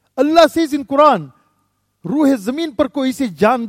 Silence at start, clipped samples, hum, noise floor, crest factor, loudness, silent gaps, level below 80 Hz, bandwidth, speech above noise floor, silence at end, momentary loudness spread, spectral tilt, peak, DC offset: 0.15 s; under 0.1%; none; -65 dBFS; 16 dB; -15 LUFS; none; -52 dBFS; 16 kHz; 51 dB; 0 s; 9 LU; -5.5 dB/octave; 0 dBFS; under 0.1%